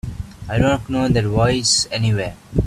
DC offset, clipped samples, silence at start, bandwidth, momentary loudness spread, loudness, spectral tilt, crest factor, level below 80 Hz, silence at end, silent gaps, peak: under 0.1%; under 0.1%; 0.05 s; 13 kHz; 9 LU; -18 LUFS; -4.5 dB/octave; 16 dB; -34 dBFS; 0 s; none; -2 dBFS